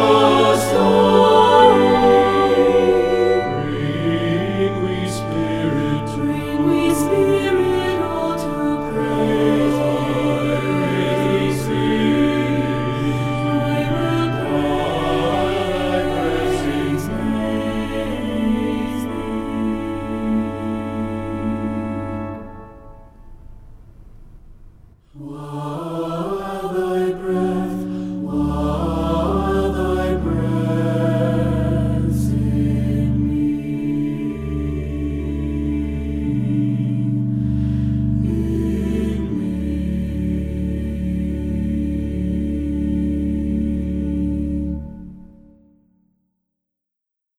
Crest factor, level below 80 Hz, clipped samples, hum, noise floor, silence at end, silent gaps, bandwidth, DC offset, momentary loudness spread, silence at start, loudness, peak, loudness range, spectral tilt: 18 dB; -32 dBFS; under 0.1%; none; -83 dBFS; 2.1 s; none; 15.5 kHz; under 0.1%; 10 LU; 0 s; -19 LUFS; 0 dBFS; 8 LU; -7 dB/octave